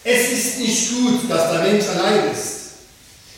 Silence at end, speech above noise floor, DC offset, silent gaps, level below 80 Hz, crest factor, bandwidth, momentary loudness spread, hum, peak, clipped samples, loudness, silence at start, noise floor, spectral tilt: 0 s; 28 dB; under 0.1%; none; -58 dBFS; 16 dB; 16.5 kHz; 10 LU; none; -4 dBFS; under 0.1%; -18 LUFS; 0.05 s; -45 dBFS; -3 dB/octave